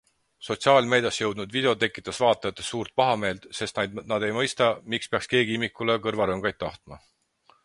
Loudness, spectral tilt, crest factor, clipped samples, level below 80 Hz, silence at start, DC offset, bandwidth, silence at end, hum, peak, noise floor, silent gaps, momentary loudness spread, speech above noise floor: -25 LUFS; -4 dB/octave; 22 dB; under 0.1%; -58 dBFS; 0.4 s; under 0.1%; 11.5 kHz; 0.7 s; none; -4 dBFS; -63 dBFS; none; 10 LU; 37 dB